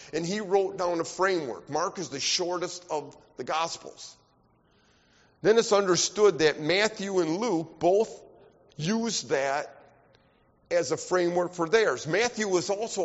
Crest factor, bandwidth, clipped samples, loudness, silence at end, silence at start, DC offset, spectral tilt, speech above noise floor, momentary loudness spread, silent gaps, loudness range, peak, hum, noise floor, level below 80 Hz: 18 dB; 8 kHz; under 0.1%; -27 LUFS; 0 s; 0 s; under 0.1%; -3 dB/octave; 38 dB; 11 LU; none; 7 LU; -8 dBFS; none; -65 dBFS; -66 dBFS